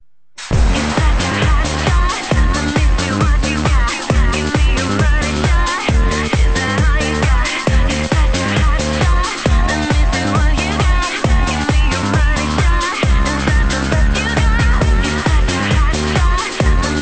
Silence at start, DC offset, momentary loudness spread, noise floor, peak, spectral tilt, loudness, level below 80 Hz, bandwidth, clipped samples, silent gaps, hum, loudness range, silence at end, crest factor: 0.4 s; 1%; 1 LU; -35 dBFS; 0 dBFS; -5 dB/octave; -15 LUFS; -16 dBFS; 9.2 kHz; under 0.1%; none; none; 0 LU; 0 s; 14 dB